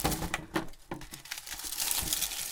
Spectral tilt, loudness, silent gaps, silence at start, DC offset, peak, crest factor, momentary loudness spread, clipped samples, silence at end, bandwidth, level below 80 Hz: -2 dB/octave; -33 LUFS; none; 0 s; under 0.1%; -8 dBFS; 26 dB; 15 LU; under 0.1%; 0 s; 19 kHz; -48 dBFS